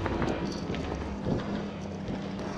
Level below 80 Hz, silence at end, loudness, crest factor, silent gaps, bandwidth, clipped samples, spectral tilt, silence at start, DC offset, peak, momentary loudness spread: -44 dBFS; 0 s; -33 LUFS; 20 dB; none; 10.5 kHz; under 0.1%; -6.5 dB/octave; 0 s; under 0.1%; -12 dBFS; 5 LU